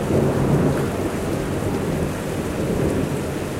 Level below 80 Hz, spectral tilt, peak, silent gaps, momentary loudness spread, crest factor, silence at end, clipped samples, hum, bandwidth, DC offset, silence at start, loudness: -36 dBFS; -6.5 dB/octave; -6 dBFS; none; 6 LU; 14 dB; 0 s; under 0.1%; none; 16 kHz; under 0.1%; 0 s; -22 LUFS